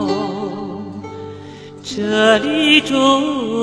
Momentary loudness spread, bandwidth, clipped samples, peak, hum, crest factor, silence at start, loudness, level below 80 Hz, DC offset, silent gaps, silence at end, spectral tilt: 20 LU; 11 kHz; under 0.1%; 0 dBFS; none; 16 dB; 0 s; -15 LUFS; -56 dBFS; under 0.1%; none; 0 s; -4 dB/octave